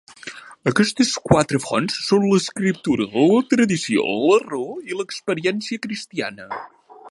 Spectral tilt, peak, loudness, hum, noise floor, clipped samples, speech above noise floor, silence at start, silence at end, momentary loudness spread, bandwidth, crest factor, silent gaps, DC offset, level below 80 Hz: -5 dB/octave; -2 dBFS; -20 LUFS; none; -39 dBFS; under 0.1%; 19 dB; 0.25 s; 0 s; 12 LU; 11.5 kHz; 20 dB; none; under 0.1%; -52 dBFS